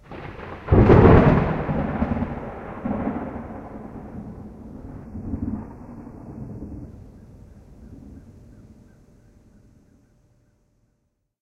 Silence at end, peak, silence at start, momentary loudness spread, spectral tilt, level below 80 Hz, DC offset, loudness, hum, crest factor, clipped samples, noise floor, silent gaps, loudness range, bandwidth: 3.2 s; 0 dBFS; 0.1 s; 26 LU; -10 dB/octave; -34 dBFS; under 0.1%; -20 LUFS; none; 22 dB; under 0.1%; -72 dBFS; none; 23 LU; 6.2 kHz